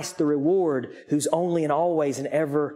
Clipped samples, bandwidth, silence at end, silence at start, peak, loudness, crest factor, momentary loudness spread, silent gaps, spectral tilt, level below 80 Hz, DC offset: under 0.1%; 15.5 kHz; 0 s; 0 s; -8 dBFS; -24 LUFS; 16 dB; 4 LU; none; -6 dB/octave; -72 dBFS; under 0.1%